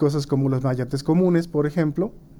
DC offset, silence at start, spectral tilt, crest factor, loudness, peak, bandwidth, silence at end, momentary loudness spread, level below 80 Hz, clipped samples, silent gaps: under 0.1%; 0 s; -8 dB/octave; 12 dB; -22 LUFS; -10 dBFS; 16.5 kHz; 0 s; 5 LU; -48 dBFS; under 0.1%; none